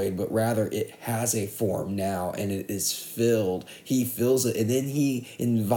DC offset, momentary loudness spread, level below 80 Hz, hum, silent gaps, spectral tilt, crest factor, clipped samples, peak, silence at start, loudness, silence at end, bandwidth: under 0.1%; 6 LU; -64 dBFS; none; none; -5 dB/octave; 16 dB; under 0.1%; -10 dBFS; 0 s; -27 LUFS; 0 s; 19.5 kHz